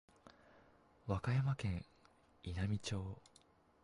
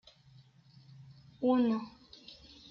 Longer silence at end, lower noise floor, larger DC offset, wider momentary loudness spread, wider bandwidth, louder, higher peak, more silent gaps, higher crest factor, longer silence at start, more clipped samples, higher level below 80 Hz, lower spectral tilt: first, 0.65 s vs 0.35 s; first, -70 dBFS vs -61 dBFS; neither; second, 16 LU vs 27 LU; first, 11.5 kHz vs 6.4 kHz; second, -41 LUFS vs -31 LUFS; second, -26 dBFS vs -18 dBFS; neither; about the same, 18 dB vs 18 dB; second, 0.25 s vs 1 s; neither; first, -56 dBFS vs -70 dBFS; about the same, -6.5 dB/octave vs -7.5 dB/octave